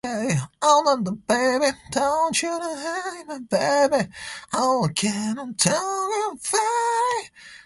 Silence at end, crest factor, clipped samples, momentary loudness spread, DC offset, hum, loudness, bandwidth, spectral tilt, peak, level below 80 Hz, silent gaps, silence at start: 0.1 s; 20 dB; under 0.1%; 9 LU; under 0.1%; none; -22 LUFS; 12 kHz; -3.5 dB/octave; -4 dBFS; -60 dBFS; none; 0.05 s